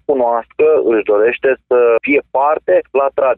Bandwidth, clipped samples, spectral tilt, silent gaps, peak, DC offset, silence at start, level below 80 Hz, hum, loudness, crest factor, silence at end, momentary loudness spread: 3.8 kHz; under 0.1%; -8.5 dB/octave; none; -2 dBFS; under 0.1%; 0.1 s; -56 dBFS; none; -13 LUFS; 10 dB; 0.05 s; 3 LU